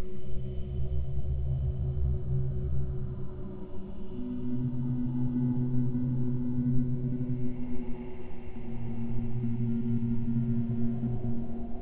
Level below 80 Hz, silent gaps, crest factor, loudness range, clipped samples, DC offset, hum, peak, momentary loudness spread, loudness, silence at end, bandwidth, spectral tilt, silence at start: -40 dBFS; none; 14 dB; 3 LU; under 0.1%; under 0.1%; none; -14 dBFS; 11 LU; -33 LUFS; 0 s; 3.8 kHz; -13 dB/octave; 0 s